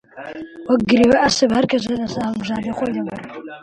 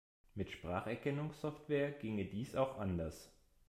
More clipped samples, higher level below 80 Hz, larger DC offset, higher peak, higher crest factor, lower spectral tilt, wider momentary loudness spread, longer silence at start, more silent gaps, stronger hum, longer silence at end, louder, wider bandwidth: neither; first, -48 dBFS vs -64 dBFS; neither; first, -4 dBFS vs -22 dBFS; about the same, 16 dB vs 20 dB; second, -4.5 dB/octave vs -7 dB/octave; first, 19 LU vs 9 LU; second, 0.15 s vs 0.35 s; neither; neither; second, 0 s vs 0.4 s; first, -18 LUFS vs -41 LUFS; second, 10.5 kHz vs 15 kHz